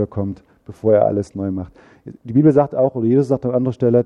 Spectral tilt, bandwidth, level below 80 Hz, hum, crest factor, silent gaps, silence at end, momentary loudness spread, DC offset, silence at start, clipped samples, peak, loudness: -10.5 dB/octave; 9.6 kHz; -52 dBFS; none; 16 dB; none; 0 s; 14 LU; under 0.1%; 0 s; under 0.1%; -2 dBFS; -17 LUFS